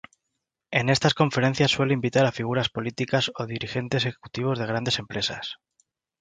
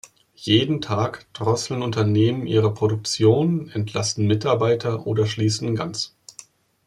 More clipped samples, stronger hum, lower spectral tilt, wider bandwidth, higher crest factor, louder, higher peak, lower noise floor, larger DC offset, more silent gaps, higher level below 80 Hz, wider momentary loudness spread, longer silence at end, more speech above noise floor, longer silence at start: neither; neither; about the same, -5 dB/octave vs -5.5 dB/octave; second, 9.4 kHz vs 11.5 kHz; about the same, 22 dB vs 18 dB; second, -25 LUFS vs -22 LUFS; about the same, -4 dBFS vs -4 dBFS; first, -82 dBFS vs -48 dBFS; neither; neither; about the same, -58 dBFS vs -58 dBFS; about the same, 8 LU vs 8 LU; second, 0.65 s vs 0.8 s; first, 57 dB vs 27 dB; first, 0.7 s vs 0.4 s